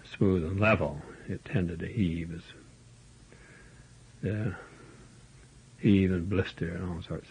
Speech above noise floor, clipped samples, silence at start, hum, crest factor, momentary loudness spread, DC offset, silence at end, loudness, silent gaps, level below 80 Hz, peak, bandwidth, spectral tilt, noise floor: 26 dB; under 0.1%; 0.05 s; none; 20 dB; 18 LU; under 0.1%; 0.1 s; -30 LUFS; none; -54 dBFS; -10 dBFS; 10 kHz; -8 dB/octave; -55 dBFS